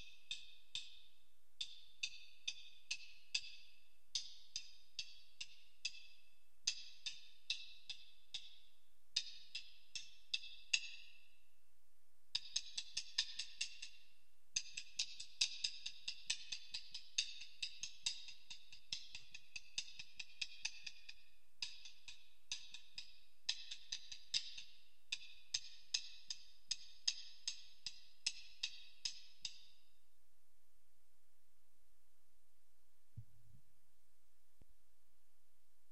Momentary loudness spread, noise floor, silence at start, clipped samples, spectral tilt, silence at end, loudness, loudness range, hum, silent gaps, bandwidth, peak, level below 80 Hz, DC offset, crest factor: 14 LU; -82 dBFS; 0 s; under 0.1%; 2.5 dB/octave; 2.35 s; -46 LUFS; 6 LU; none; none; 14.5 kHz; -16 dBFS; -82 dBFS; 0.3%; 34 dB